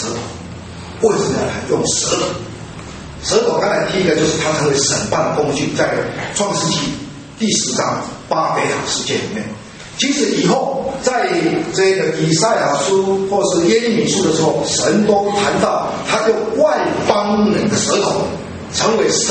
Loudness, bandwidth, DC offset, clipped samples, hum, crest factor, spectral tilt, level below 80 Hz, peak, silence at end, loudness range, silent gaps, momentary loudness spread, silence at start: -16 LUFS; 8.8 kHz; under 0.1%; under 0.1%; none; 16 dB; -3.5 dB/octave; -46 dBFS; 0 dBFS; 0 s; 3 LU; none; 11 LU; 0 s